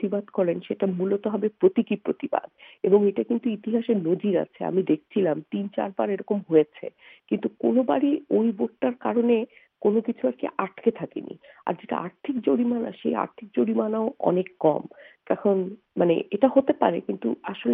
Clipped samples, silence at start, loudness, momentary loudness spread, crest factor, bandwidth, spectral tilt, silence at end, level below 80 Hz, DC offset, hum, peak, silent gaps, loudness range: under 0.1%; 0 s; -25 LUFS; 9 LU; 20 dB; 3.8 kHz; -10.5 dB/octave; 0 s; -74 dBFS; under 0.1%; none; -4 dBFS; none; 3 LU